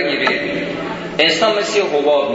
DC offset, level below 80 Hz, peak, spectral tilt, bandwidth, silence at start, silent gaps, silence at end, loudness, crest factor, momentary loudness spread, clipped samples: under 0.1%; -52 dBFS; 0 dBFS; -3.5 dB/octave; 8 kHz; 0 s; none; 0 s; -16 LUFS; 16 dB; 10 LU; under 0.1%